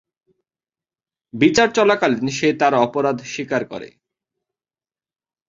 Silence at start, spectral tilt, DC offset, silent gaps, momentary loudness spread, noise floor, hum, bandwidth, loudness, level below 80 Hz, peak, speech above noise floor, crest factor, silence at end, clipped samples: 1.35 s; -4.5 dB/octave; under 0.1%; none; 13 LU; under -90 dBFS; none; 7.8 kHz; -18 LUFS; -58 dBFS; 0 dBFS; over 72 dB; 20 dB; 1.6 s; under 0.1%